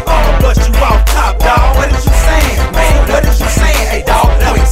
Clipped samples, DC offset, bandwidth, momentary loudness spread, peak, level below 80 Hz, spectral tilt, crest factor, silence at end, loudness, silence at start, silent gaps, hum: 0.9%; under 0.1%; 16 kHz; 2 LU; 0 dBFS; -10 dBFS; -5 dB/octave; 8 dB; 0 s; -10 LUFS; 0 s; none; none